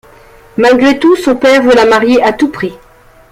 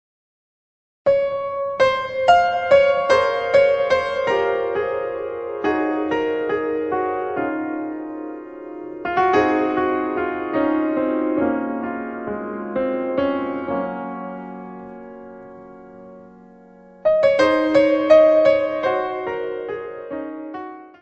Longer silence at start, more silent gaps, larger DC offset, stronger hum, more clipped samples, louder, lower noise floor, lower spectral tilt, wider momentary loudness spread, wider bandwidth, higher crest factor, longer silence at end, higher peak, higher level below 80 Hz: second, 0.55 s vs 1.05 s; neither; neither; neither; neither; first, -8 LUFS vs -20 LUFS; second, -38 dBFS vs -46 dBFS; about the same, -4.5 dB/octave vs -5.5 dB/octave; second, 11 LU vs 17 LU; first, 15.5 kHz vs 8.4 kHz; second, 10 dB vs 20 dB; first, 0.55 s vs 0.15 s; about the same, 0 dBFS vs -2 dBFS; first, -42 dBFS vs -56 dBFS